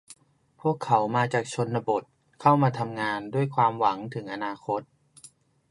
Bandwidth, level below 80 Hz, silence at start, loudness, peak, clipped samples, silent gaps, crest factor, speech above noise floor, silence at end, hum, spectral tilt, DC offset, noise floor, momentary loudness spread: 11.5 kHz; -70 dBFS; 0.1 s; -26 LUFS; -6 dBFS; under 0.1%; none; 22 dB; 34 dB; 0.45 s; none; -6.5 dB/octave; under 0.1%; -60 dBFS; 10 LU